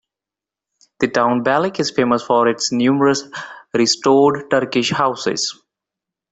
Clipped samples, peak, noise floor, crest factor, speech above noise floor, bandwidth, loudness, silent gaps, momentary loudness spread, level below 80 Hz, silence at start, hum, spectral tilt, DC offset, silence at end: under 0.1%; -2 dBFS; -88 dBFS; 16 dB; 71 dB; 8.4 kHz; -17 LUFS; none; 9 LU; -58 dBFS; 1 s; none; -4 dB/octave; under 0.1%; 0.8 s